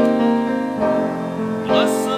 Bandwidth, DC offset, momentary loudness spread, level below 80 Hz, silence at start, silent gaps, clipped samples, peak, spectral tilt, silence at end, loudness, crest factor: 15.5 kHz; under 0.1%; 7 LU; -52 dBFS; 0 s; none; under 0.1%; -4 dBFS; -5.5 dB/octave; 0 s; -19 LUFS; 14 dB